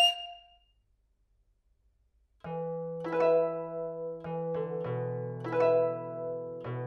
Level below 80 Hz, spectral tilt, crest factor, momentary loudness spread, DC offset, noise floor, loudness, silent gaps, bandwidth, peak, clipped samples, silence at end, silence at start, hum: -70 dBFS; -5 dB/octave; 18 dB; 13 LU; under 0.1%; -71 dBFS; -32 LUFS; none; 12 kHz; -14 dBFS; under 0.1%; 0 s; 0 s; none